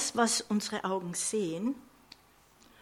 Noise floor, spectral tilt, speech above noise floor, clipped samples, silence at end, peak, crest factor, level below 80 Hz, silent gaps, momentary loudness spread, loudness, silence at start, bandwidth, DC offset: -62 dBFS; -3 dB/octave; 30 dB; under 0.1%; 0.95 s; -12 dBFS; 20 dB; -72 dBFS; none; 8 LU; -31 LUFS; 0 s; 16 kHz; under 0.1%